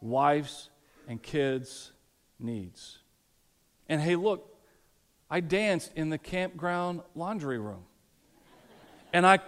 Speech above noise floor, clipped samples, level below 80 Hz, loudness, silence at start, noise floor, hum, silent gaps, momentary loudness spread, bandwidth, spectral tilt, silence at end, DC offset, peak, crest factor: 39 dB; under 0.1%; -64 dBFS; -30 LUFS; 0 s; -69 dBFS; none; none; 19 LU; 15.5 kHz; -5.5 dB/octave; 0 s; under 0.1%; -8 dBFS; 24 dB